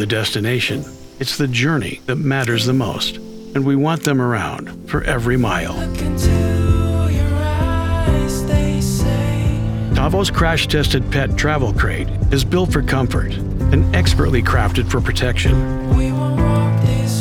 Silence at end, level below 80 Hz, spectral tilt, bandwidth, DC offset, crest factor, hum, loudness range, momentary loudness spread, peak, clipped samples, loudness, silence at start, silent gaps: 0 s; -24 dBFS; -5.5 dB/octave; 17 kHz; under 0.1%; 16 dB; none; 2 LU; 6 LU; 0 dBFS; under 0.1%; -17 LUFS; 0 s; none